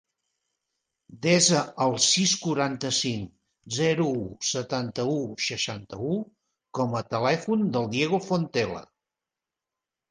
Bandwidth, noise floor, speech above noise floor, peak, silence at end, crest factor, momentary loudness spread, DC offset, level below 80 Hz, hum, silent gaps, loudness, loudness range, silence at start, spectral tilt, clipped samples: 10.5 kHz; -89 dBFS; 63 dB; -8 dBFS; 1.3 s; 20 dB; 12 LU; under 0.1%; -62 dBFS; none; none; -25 LUFS; 5 LU; 1.1 s; -3.5 dB/octave; under 0.1%